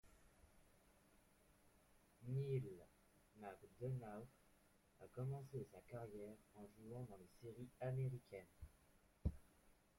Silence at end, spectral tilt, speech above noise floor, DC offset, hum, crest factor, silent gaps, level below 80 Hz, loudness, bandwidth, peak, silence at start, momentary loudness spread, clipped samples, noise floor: 0.25 s; -8.5 dB/octave; 24 dB; under 0.1%; none; 22 dB; none; -66 dBFS; -52 LUFS; 16.5 kHz; -32 dBFS; 0.05 s; 17 LU; under 0.1%; -75 dBFS